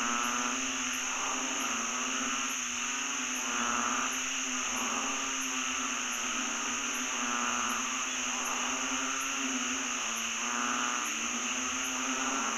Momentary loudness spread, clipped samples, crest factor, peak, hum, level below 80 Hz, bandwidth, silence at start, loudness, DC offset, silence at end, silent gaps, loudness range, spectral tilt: 2 LU; under 0.1%; 16 dB; -18 dBFS; none; -64 dBFS; 16 kHz; 0 s; -31 LUFS; under 0.1%; 0 s; none; 0 LU; 1 dB/octave